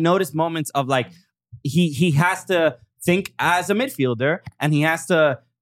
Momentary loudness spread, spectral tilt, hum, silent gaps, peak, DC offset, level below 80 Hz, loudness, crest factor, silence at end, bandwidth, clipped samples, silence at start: 6 LU; -5.5 dB/octave; none; none; -4 dBFS; under 0.1%; -60 dBFS; -20 LUFS; 18 dB; 0.25 s; 16.5 kHz; under 0.1%; 0 s